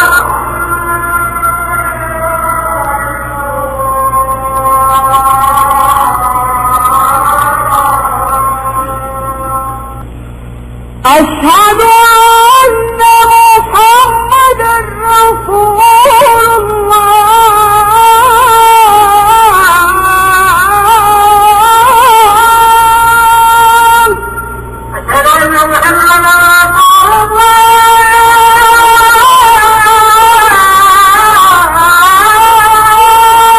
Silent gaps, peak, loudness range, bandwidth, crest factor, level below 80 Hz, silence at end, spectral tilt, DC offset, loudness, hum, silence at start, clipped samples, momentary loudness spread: none; 0 dBFS; 8 LU; 16 kHz; 6 dB; -28 dBFS; 0 s; -2 dB/octave; under 0.1%; -5 LUFS; 60 Hz at -30 dBFS; 0 s; 3%; 10 LU